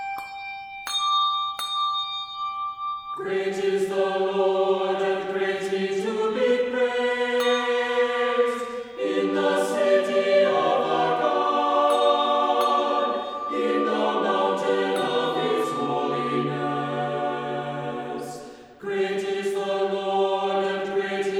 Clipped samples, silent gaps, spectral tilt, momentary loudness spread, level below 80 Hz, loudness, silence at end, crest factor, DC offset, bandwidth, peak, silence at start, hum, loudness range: under 0.1%; none; -4.5 dB/octave; 10 LU; -68 dBFS; -24 LUFS; 0 s; 16 dB; under 0.1%; over 20 kHz; -8 dBFS; 0 s; none; 6 LU